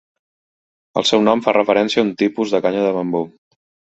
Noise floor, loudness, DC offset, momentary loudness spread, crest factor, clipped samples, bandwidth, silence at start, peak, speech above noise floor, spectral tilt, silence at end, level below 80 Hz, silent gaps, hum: under -90 dBFS; -17 LUFS; under 0.1%; 8 LU; 18 dB; under 0.1%; 8.2 kHz; 0.95 s; -2 dBFS; over 74 dB; -4.5 dB/octave; 0.7 s; -60 dBFS; none; none